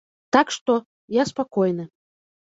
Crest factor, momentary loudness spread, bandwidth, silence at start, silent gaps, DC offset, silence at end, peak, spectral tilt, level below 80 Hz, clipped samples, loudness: 20 dB; 7 LU; 8 kHz; 0.35 s; 0.61-0.66 s, 0.86-1.08 s; under 0.1%; 0.55 s; -4 dBFS; -5 dB/octave; -64 dBFS; under 0.1%; -23 LUFS